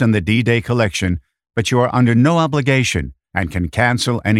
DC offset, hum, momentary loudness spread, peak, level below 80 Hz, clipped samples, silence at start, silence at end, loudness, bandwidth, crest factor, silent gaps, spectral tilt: under 0.1%; none; 10 LU; 0 dBFS; -38 dBFS; under 0.1%; 0 s; 0 s; -17 LUFS; 13 kHz; 16 dB; none; -5.5 dB/octave